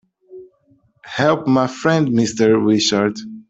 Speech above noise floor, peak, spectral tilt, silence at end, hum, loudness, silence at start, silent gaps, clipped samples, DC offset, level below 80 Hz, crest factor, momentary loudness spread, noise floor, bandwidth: 42 dB; -2 dBFS; -5 dB/octave; 0.1 s; none; -16 LUFS; 0.3 s; none; under 0.1%; under 0.1%; -58 dBFS; 16 dB; 5 LU; -58 dBFS; 8.2 kHz